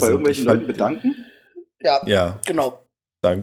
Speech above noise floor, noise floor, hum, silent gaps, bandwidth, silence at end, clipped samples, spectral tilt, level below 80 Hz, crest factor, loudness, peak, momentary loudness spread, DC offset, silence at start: 26 dB; -45 dBFS; none; none; 17.5 kHz; 0 s; under 0.1%; -5 dB/octave; -58 dBFS; 20 dB; -20 LUFS; 0 dBFS; 7 LU; under 0.1%; 0 s